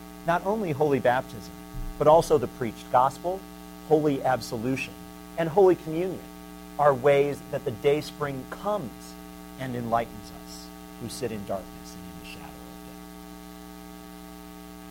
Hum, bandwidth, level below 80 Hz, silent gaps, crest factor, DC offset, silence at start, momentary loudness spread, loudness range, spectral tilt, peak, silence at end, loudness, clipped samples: none; 17 kHz; -50 dBFS; none; 20 dB; under 0.1%; 0 s; 22 LU; 13 LU; -6 dB/octave; -6 dBFS; 0 s; -26 LUFS; under 0.1%